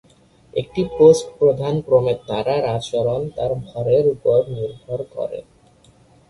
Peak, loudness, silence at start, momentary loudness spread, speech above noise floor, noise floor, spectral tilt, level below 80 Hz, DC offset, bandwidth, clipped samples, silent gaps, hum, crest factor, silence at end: -2 dBFS; -19 LUFS; 0.55 s; 15 LU; 34 dB; -52 dBFS; -6.5 dB/octave; -50 dBFS; under 0.1%; 11.5 kHz; under 0.1%; none; none; 18 dB; 0.9 s